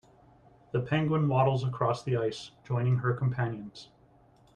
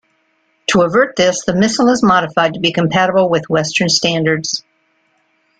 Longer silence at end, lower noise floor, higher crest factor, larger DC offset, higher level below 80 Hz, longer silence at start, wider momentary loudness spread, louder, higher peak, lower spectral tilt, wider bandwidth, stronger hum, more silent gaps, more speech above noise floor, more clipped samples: second, 0.7 s vs 1 s; about the same, -61 dBFS vs -61 dBFS; about the same, 18 dB vs 14 dB; neither; second, -62 dBFS vs -52 dBFS; about the same, 0.75 s vs 0.7 s; first, 14 LU vs 4 LU; second, -29 LUFS vs -14 LUFS; second, -12 dBFS vs -2 dBFS; first, -7.5 dB/octave vs -4 dB/octave; about the same, 9 kHz vs 9.4 kHz; neither; neither; second, 32 dB vs 47 dB; neither